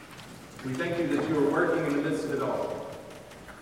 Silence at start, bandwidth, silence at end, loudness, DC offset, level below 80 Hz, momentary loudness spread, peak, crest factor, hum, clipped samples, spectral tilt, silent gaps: 0 s; 16 kHz; 0 s; -29 LUFS; under 0.1%; -60 dBFS; 19 LU; -14 dBFS; 16 dB; none; under 0.1%; -6 dB/octave; none